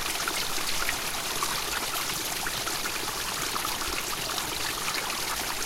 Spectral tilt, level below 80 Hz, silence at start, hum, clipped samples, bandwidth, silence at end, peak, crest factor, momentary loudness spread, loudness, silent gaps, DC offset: -0.5 dB/octave; -48 dBFS; 0 s; none; under 0.1%; 17 kHz; 0 s; -12 dBFS; 18 dB; 1 LU; -28 LUFS; none; under 0.1%